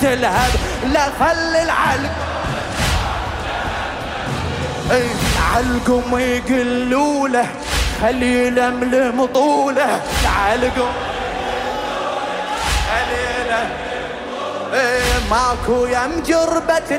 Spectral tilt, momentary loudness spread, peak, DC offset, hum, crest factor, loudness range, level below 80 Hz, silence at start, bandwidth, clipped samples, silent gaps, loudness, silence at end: -4.5 dB/octave; 7 LU; -6 dBFS; under 0.1%; none; 12 dB; 4 LU; -28 dBFS; 0 s; 16 kHz; under 0.1%; none; -18 LUFS; 0 s